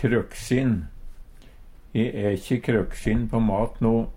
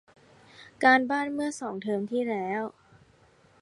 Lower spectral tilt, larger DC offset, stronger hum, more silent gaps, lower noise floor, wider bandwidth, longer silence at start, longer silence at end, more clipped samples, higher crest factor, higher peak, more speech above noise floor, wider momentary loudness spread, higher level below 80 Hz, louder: first, -7.5 dB/octave vs -4.5 dB/octave; neither; neither; neither; second, -45 dBFS vs -60 dBFS; first, 16 kHz vs 11.5 kHz; second, 0 s vs 0.6 s; second, 0 s vs 0.9 s; neither; second, 16 dB vs 22 dB; about the same, -8 dBFS vs -6 dBFS; second, 22 dB vs 34 dB; second, 4 LU vs 12 LU; first, -36 dBFS vs -72 dBFS; about the same, -25 LUFS vs -27 LUFS